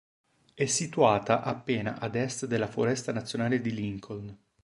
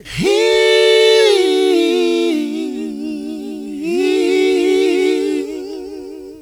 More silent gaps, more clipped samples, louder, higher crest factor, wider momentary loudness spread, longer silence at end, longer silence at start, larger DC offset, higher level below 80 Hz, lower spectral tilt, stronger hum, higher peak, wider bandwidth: neither; neither; second, -29 LUFS vs -14 LUFS; first, 22 dB vs 14 dB; second, 12 LU vs 16 LU; first, 0.3 s vs 0 s; first, 0.55 s vs 0.05 s; neither; second, -62 dBFS vs -50 dBFS; about the same, -4.5 dB/octave vs -3.5 dB/octave; neither; second, -8 dBFS vs 0 dBFS; second, 11.5 kHz vs 17.5 kHz